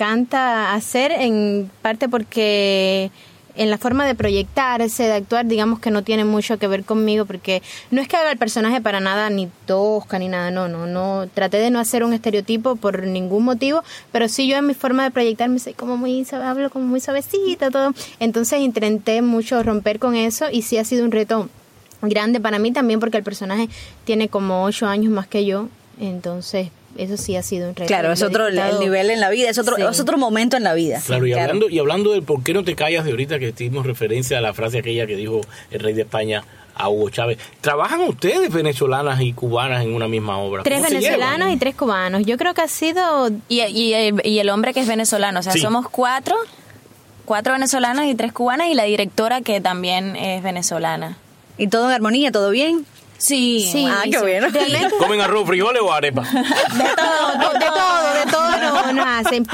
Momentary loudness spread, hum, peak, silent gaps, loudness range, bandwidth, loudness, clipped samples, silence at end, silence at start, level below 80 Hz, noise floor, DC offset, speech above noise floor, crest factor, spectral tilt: 7 LU; none; -2 dBFS; none; 4 LU; 16.5 kHz; -18 LUFS; under 0.1%; 0 s; 0 s; -52 dBFS; -46 dBFS; under 0.1%; 27 dB; 18 dB; -4 dB/octave